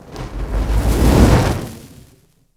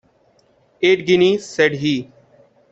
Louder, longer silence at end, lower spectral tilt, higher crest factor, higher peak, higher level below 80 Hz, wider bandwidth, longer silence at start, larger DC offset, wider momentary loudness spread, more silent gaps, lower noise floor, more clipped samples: about the same, -16 LUFS vs -17 LUFS; about the same, 0.7 s vs 0.7 s; first, -6.5 dB/octave vs -5 dB/octave; about the same, 16 dB vs 18 dB; about the same, 0 dBFS vs -2 dBFS; first, -20 dBFS vs -60 dBFS; first, 16 kHz vs 8 kHz; second, 0.05 s vs 0.8 s; neither; first, 17 LU vs 7 LU; neither; second, -52 dBFS vs -57 dBFS; neither